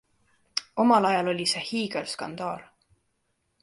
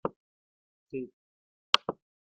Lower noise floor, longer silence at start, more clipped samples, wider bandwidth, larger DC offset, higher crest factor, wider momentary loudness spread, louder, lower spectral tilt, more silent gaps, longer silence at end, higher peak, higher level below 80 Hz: second, -75 dBFS vs under -90 dBFS; first, 0.55 s vs 0.05 s; neither; first, 11.5 kHz vs 7.2 kHz; neither; second, 20 dB vs 36 dB; second, 13 LU vs 18 LU; first, -26 LUFS vs -31 LUFS; first, -4 dB/octave vs 0 dB/octave; second, none vs 0.16-0.86 s, 1.13-1.73 s; first, 1 s vs 0.45 s; second, -8 dBFS vs 0 dBFS; first, -70 dBFS vs -76 dBFS